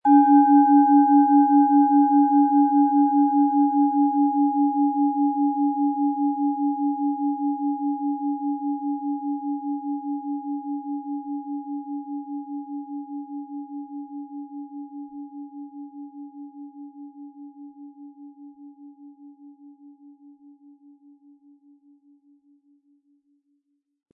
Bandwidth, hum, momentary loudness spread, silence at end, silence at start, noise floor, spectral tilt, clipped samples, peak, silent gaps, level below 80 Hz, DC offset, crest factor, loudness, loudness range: 1.7 kHz; none; 24 LU; 4.25 s; 0.05 s; -73 dBFS; -10.5 dB/octave; under 0.1%; -6 dBFS; none; -86 dBFS; under 0.1%; 18 dB; -21 LUFS; 23 LU